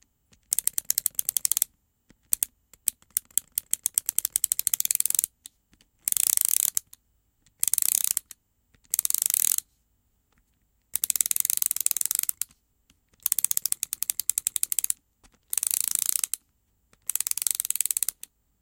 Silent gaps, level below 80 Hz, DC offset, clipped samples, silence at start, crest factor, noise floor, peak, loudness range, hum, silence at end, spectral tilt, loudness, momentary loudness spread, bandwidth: none; -68 dBFS; under 0.1%; under 0.1%; 0.5 s; 30 dB; -70 dBFS; 0 dBFS; 2 LU; none; 0.5 s; 3 dB/octave; -25 LUFS; 9 LU; 17.5 kHz